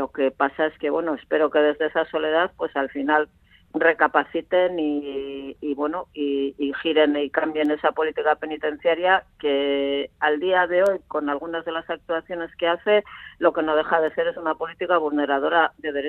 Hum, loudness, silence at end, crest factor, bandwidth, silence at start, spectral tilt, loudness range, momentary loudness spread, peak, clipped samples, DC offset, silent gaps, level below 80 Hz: none; -23 LUFS; 0 s; 20 dB; 4.4 kHz; 0 s; -6 dB/octave; 2 LU; 8 LU; -2 dBFS; under 0.1%; under 0.1%; none; -60 dBFS